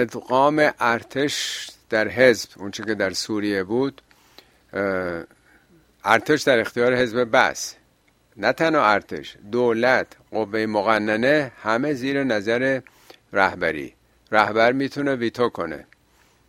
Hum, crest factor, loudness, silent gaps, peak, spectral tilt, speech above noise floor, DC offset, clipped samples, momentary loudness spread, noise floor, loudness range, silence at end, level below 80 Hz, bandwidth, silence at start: none; 22 dB; -21 LUFS; none; 0 dBFS; -4.5 dB/octave; 40 dB; under 0.1%; under 0.1%; 12 LU; -61 dBFS; 3 LU; 0.65 s; -60 dBFS; 16 kHz; 0 s